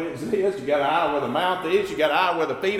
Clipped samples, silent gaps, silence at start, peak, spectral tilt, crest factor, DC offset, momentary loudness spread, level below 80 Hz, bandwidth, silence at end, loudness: under 0.1%; none; 0 s; -8 dBFS; -5 dB/octave; 16 dB; under 0.1%; 4 LU; -58 dBFS; 15.5 kHz; 0 s; -23 LUFS